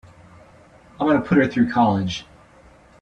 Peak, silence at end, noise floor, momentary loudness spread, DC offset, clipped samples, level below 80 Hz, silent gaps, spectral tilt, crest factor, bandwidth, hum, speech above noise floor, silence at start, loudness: -4 dBFS; 0.8 s; -50 dBFS; 9 LU; under 0.1%; under 0.1%; -52 dBFS; none; -7 dB/octave; 18 dB; 8.2 kHz; none; 31 dB; 1 s; -20 LUFS